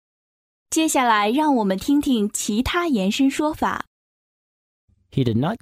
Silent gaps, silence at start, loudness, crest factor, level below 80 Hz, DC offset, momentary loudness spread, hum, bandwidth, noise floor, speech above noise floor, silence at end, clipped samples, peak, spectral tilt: 3.87-4.88 s; 0.7 s; -21 LUFS; 16 dB; -48 dBFS; under 0.1%; 7 LU; none; 16 kHz; under -90 dBFS; over 70 dB; 0.05 s; under 0.1%; -6 dBFS; -4.5 dB/octave